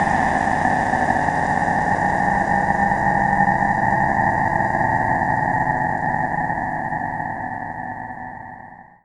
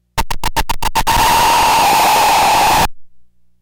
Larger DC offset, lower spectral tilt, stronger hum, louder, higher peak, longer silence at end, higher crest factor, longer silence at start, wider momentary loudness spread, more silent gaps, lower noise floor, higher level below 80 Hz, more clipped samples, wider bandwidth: neither; first, -6.5 dB/octave vs -2 dB/octave; neither; second, -19 LUFS vs -12 LUFS; first, -2 dBFS vs -6 dBFS; first, 0.2 s vs 0 s; first, 18 dB vs 8 dB; about the same, 0 s vs 0 s; about the same, 11 LU vs 9 LU; neither; about the same, -41 dBFS vs -41 dBFS; second, -40 dBFS vs -26 dBFS; neither; second, 11 kHz vs 19 kHz